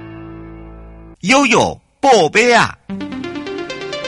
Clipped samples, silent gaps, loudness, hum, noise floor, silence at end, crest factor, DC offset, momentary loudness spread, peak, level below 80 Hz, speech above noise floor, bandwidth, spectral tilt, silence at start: under 0.1%; none; -14 LUFS; none; -37 dBFS; 0 s; 16 dB; under 0.1%; 22 LU; 0 dBFS; -44 dBFS; 24 dB; 11.5 kHz; -3.5 dB/octave; 0 s